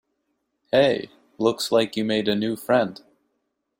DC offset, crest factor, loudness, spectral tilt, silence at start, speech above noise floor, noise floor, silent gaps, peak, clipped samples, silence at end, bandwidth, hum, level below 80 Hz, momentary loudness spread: under 0.1%; 18 dB; -23 LUFS; -5 dB/octave; 0.75 s; 54 dB; -75 dBFS; none; -6 dBFS; under 0.1%; 0.85 s; 16 kHz; none; -64 dBFS; 8 LU